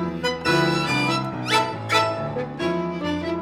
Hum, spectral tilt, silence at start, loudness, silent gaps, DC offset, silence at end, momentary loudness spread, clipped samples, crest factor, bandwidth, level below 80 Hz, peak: none; -4.5 dB/octave; 0 s; -22 LUFS; none; under 0.1%; 0 s; 6 LU; under 0.1%; 18 dB; 16.5 kHz; -52 dBFS; -6 dBFS